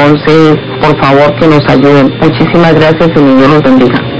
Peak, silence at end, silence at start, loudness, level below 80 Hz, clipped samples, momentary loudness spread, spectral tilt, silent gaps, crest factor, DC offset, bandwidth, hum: 0 dBFS; 0 s; 0 s; -5 LUFS; -34 dBFS; 10%; 3 LU; -8 dB/octave; none; 6 dB; 4%; 8 kHz; none